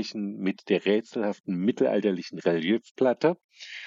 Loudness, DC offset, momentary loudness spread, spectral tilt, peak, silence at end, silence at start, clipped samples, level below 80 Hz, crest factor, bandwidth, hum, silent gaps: -27 LUFS; under 0.1%; 7 LU; -6.5 dB/octave; -10 dBFS; 0 s; 0 s; under 0.1%; -78 dBFS; 18 dB; 7.6 kHz; none; 1.40-1.44 s, 2.91-2.95 s, 3.44-3.49 s